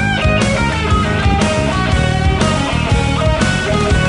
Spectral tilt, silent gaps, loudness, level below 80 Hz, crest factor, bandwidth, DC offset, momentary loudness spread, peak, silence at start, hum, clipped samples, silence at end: -5.5 dB/octave; none; -14 LUFS; -22 dBFS; 12 dB; 11 kHz; under 0.1%; 1 LU; 0 dBFS; 0 s; none; under 0.1%; 0 s